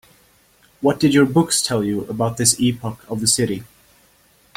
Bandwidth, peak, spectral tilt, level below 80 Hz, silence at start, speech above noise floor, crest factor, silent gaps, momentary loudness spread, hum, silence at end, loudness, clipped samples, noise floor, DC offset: 16.5 kHz; -2 dBFS; -4 dB/octave; -54 dBFS; 0.8 s; 37 dB; 18 dB; none; 9 LU; none; 0.95 s; -18 LUFS; under 0.1%; -56 dBFS; under 0.1%